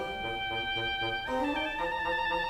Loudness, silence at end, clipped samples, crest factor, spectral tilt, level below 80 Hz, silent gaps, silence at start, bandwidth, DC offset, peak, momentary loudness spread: -31 LUFS; 0 s; under 0.1%; 12 dB; -4.5 dB/octave; -52 dBFS; none; 0 s; 16 kHz; under 0.1%; -20 dBFS; 2 LU